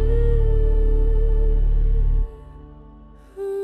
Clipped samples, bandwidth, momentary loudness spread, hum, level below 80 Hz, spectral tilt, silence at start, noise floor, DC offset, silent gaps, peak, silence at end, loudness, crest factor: under 0.1%; 3.1 kHz; 21 LU; none; -18 dBFS; -10 dB/octave; 0 s; -44 dBFS; under 0.1%; none; -8 dBFS; 0 s; -23 LUFS; 10 dB